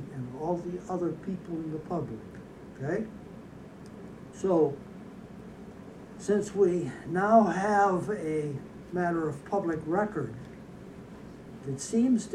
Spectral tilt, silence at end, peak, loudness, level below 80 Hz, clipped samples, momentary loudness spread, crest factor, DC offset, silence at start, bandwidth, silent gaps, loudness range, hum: -7 dB/octave; 0 s; -10 dBFS; -29 LUFS; -60 dBFS; under 0.1%; 21 LU; 20 dB; under 0.1%; 0 s; 12 kHz; none; 9 LU; none